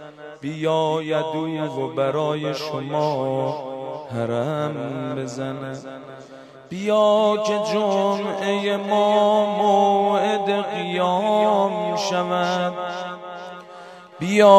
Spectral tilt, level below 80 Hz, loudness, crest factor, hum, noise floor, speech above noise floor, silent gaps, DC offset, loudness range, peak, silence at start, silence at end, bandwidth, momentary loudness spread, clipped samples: -5.5 dB/octave; -70 dBFS; -22 LUFS; 22 dB; none; -43 dBFS; 22 dB; none; under 0.1%; 7 LU; 0 dBFS; 0 s; 0 s; 13 kHz; 18 LU; under 0.1%